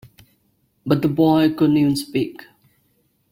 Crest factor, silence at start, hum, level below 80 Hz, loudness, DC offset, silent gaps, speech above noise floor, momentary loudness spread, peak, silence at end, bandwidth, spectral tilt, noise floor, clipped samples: 18 dB; 0.85 s; none; -54 dBFS; -18 LUFS; under 0.1%; none; 47 dB; 10 LU; -2 dBFS; 1 s; 16.5 kHz; -7 dB/octave; -65 dBFS; under 0.1%